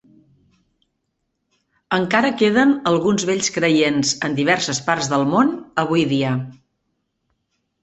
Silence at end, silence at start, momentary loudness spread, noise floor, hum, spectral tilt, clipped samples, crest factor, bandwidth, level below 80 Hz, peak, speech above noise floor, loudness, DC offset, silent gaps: 1.3 s; 1.9 s; 6 LU; -74 dBFS; none; -4.5 dB/octave; under 0.1%; 18 dB; 8.4 kHz; -58 dBFS; -2 dBFS; 56 dB; -18 LUFS; under 0.1%; none